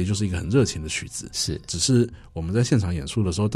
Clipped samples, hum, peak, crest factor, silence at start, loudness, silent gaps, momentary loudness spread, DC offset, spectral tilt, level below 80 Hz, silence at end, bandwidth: under 0.1%; none; -8 dBFS; 16 dB; 0 s; -24 LUFS; none; 8 LU; under 0.1%; -5 dB/octave; -40 dBFS; 0 s; 14.5 kHz